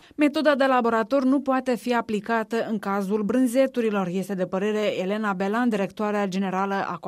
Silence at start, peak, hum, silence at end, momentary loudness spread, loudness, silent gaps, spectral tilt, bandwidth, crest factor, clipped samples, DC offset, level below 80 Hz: 0.2 s; -8 dBFS; none; 0 s; 6 LU; -24 LUFS; none; -6 dB/octave; 15 kHz; 16 dB; under 0.1%; under 0.1%; -68 dBFS